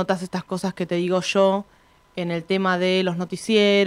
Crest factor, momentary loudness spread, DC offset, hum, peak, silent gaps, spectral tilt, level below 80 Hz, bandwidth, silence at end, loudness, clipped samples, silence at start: 16 dB; 9 LU; under 0.1%; none; -6 dBFS; none; -5.5 dB/octave; -62 dBFS; 13 kHz; 0 s; -22 LUFS; under 0.1%; 0 s